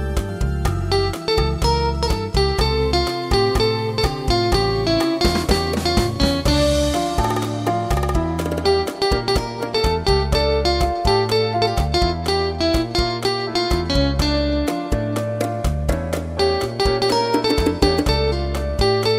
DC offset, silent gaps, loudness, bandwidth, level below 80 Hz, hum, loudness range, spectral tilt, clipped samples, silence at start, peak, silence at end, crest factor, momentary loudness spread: under 0.1%; none; -19 LUFS; 16 kHz; -26 dBFS; none; 2 LU; -5.5 dB/octave; under 0.1%; 0 s; -2 dBFS; 0 s; 16 dB; 5 LU